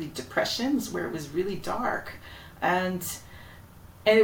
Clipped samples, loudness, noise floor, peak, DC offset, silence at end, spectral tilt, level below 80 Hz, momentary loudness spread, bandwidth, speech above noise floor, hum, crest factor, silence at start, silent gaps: under 0.1%; -29 LUFS; -49 dBFS; -8 dBFS; under 0.1%; 0 s; -4 dB/octave; -54 dBFS; 20 LU; 17 kHz; 19 dB; none; 20 dB; 0 s; none